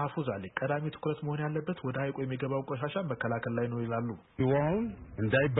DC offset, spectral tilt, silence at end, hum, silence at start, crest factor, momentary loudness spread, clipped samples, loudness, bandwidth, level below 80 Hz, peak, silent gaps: under 0.1%; -11 dB/octave; 0 s; none; 0 s; 18 dB; 7 LU; under 0.1%; -33 LUFS; 4.1 kHz; -58 dBFS; -14 dBFS; none